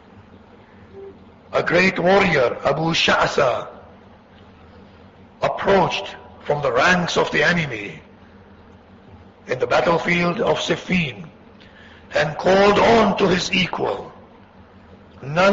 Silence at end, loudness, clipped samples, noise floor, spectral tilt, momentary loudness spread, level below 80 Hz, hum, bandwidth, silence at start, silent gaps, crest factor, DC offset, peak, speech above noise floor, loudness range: 0 s; -18 LUFS; under 0.1%; -46 dBFS; -5 dB/octave; 15 LU; -48 dBFS; none; 7.8 kHz; 0.15 s; none; 16 dB; under 0.1%; -4 dBFS; 28 dB; 4 LU